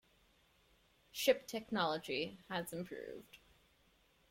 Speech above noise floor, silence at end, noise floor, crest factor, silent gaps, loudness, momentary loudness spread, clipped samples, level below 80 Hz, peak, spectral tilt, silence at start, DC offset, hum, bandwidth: 33 dB; 0.95 s; -72 dBFS; 24 dB; none; -39 LUFS; 15 LU; under 0.1%; -74 dBFS; -18 dBFS; -3.5 dB/octave; 1.15 s; under 0.1%; none; 16.5 kHz